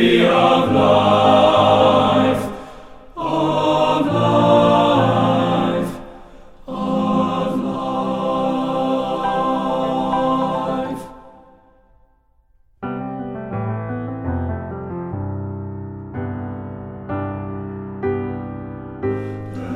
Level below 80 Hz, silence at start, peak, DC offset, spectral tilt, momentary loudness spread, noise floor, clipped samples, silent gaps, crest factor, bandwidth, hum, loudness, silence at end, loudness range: -46 dBFS; 0 s; -2 dBFS; under 0.1%; -7 dB/octave; 17 LU; -57 dBFS; under 0.1%; none; 18 dB; 14 kHz; none; -18 LUFS; 0 s; 12 LU